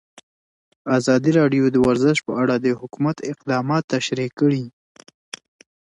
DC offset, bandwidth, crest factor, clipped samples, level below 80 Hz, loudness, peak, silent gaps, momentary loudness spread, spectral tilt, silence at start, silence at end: under 0.1%; 11 kHz; 16 dB; under 0.1%; -56 dBFS; -20 LUFS; -4 dBFS; 3.84-3.88 s; 19 LU; -6 dB/octave; 0.85 s; 1.15 s